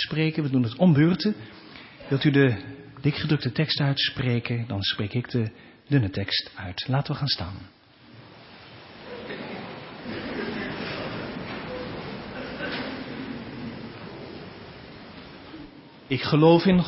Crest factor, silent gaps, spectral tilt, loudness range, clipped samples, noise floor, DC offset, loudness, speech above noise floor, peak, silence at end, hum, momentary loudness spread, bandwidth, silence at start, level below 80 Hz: 22 dB; none; -10.5 dB/octave; 12 LU; under 0.1%; -50 dBFS; under 0.1%; -26 LUFS; 27 dB; -4 dBFS; 0 s; none; 22 LU; 5.8 kHz; 0 s; -52 dBFS